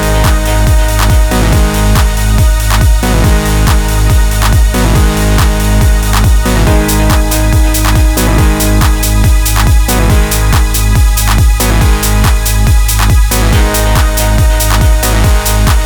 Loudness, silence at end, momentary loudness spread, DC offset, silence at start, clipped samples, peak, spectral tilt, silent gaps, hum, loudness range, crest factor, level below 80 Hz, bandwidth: -10 LUFS; 0 s; 1 LU; 0.7%; 0 s; under 0.1%; 0 dBFS; -4.5 dB/octave; none; none; 0 LU; 8 dB; -10 dBFS; over 20 kHz